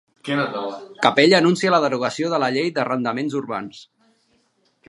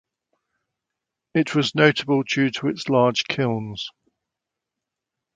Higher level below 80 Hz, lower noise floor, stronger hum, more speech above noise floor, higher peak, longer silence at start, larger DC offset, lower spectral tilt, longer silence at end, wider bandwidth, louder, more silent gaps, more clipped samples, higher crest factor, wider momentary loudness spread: second, -70 dBFS vs -64 dBFS; second, -64 dBFS vs -85 dBFS; neither; second, 44 dB vs 64 dB; about the same, 0 dBFS vs -2 dBFS; second, 0.25 s vs 1.35 s; neither; about the same, -5 dB/octave vs -5.5 dB/octave; second, 1.05 s vs 1.45 s; first, 11.5 kHz vs 9.2 kHz; about the same, -20 LUFS vs -21 LUFS; neither; neither; about the same, 20 dB vs 22 dB; first, 15 LU vs 11 LU